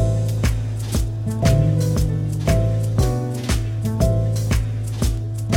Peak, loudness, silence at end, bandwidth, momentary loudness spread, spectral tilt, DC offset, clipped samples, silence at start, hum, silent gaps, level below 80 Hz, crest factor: -4 dBFS; -21 LUFS; 0 s; 16.5 kHz; 6 LU; -6.5 dB/octave; under 0.1%; under 0.1%; 0 s; none; none; -26 dBFS; 16 dB